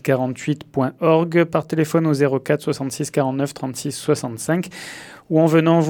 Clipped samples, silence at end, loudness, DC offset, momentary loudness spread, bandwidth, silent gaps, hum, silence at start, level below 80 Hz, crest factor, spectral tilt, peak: under 0.1%; 0 s; -20 LUFS; under 0.1%; 10 LU; 18.5 kHz; none; none; 0.05 s; -62 dBFS; 18 dB; -6.5 dB/octave; -2 dBFS